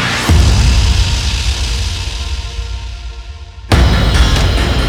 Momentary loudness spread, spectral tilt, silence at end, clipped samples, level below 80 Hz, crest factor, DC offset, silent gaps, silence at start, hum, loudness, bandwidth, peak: 17 LU; -4.5 dB/octave; 0 s; under 0.1%; -14 dBFS; 12 dB; under 0.1%; none; 0 s; none; -13 LUFS; 14.5 kHz; 0 dBFS